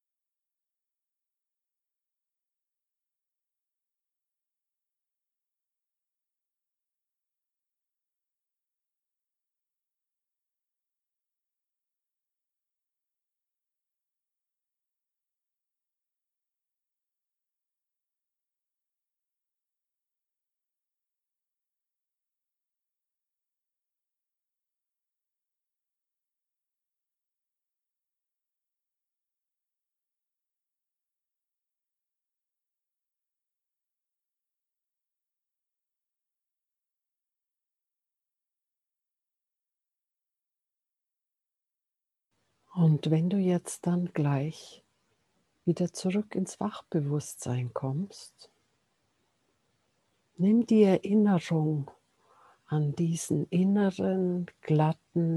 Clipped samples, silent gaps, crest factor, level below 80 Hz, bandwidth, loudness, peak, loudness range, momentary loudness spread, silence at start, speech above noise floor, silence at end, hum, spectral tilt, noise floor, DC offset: under 0.1%; none; 26 dB; -80 dBFS; 12.5 kHz; -28 LUFS; -10 dBFS; 8 LU; 11 LU; 42.75 s; 62 dB; 0 s; none; -7.5 dB/octave; -89 dBFS; under 0.1%